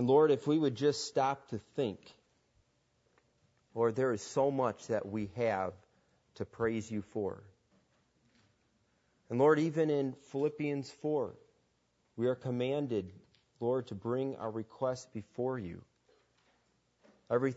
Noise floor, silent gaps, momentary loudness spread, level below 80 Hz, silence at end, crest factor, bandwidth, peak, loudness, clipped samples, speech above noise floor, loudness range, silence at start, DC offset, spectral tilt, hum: -76 dBFS; none; 12 LU; -74 dBFS; 0 s; 20 dB; 8 kHz; -14 dBFS; -34 LUFS; under 0.1%; 43 dB; 6 LU; 0 s; under 0.1%; -6.5 dB/octave; none